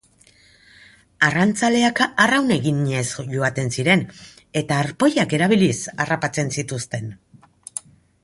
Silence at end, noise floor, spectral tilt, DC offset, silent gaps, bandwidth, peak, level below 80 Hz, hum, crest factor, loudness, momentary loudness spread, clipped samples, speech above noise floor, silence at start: 0.45 s; -54 dBFS; -4.5 dB/octave; under 0.1%; none; 11.5 kHz; -2 dBFS; -56 dBFS; none; 20 dB; -20 LUFS; 13 LU; under 0.1%; 34 dB; 1.2 s